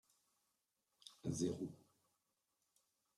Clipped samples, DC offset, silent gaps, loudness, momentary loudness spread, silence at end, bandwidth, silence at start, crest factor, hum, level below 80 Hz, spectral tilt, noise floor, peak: under 0.1%; under 0.1%; none; -45 LUFS; 20 LU; 1.4 s; 14.5 kHz; 1.05 s; 22 dB; none; -80 dBFS; -6 dB/octave; -87 dBFS; -28 dBFS